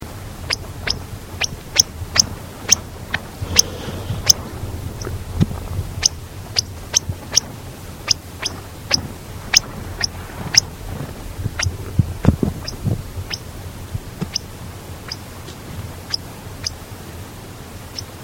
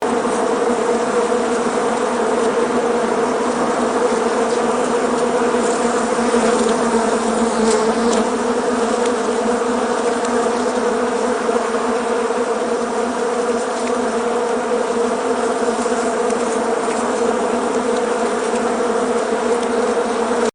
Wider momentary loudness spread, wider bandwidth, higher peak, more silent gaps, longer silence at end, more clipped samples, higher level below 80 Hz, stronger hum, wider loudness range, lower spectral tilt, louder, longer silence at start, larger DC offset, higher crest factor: first, 18 LU vs 3 LU; first, over 20 kHz vs 11 kHz; first, 0 dBFS vs -4 dBFS; neither; about the same, 0 s vs 0.05 s; first, 0.1% vs under 0.1%; first, -36 dBFS vs -50 dBFS; neither; first, 11 LU vs 2 LU; about the same, -2.5 dB/octave vs -3.5 dB/octave; about the same, -20 LUFS vs -18 LUFS; about the same, 0 s vs 0 s; neither; first, 24 dB vs 14 dB